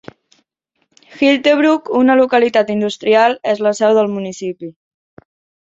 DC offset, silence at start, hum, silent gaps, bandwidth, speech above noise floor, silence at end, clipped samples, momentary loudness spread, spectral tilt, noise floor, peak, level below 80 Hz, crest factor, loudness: under 0.1%; 1.15 s; none; none; 7.8 kHz; 54 dB; 0.9 s; under 0.1%; 13 LU; -5 dB/octave; -68 dBFS; -2 dBFS; -62 dBFS; 14 dB; -14 LUFS